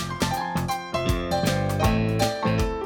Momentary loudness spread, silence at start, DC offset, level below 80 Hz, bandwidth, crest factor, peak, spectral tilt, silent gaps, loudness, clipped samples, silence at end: 4 LU; 0 s; under 0.1%; -34 dBFS; 19 kHz; 16 dB; -8 dBFS; -5.5 dB/octave; none; -25 LUFS; under 0.1%; 0 s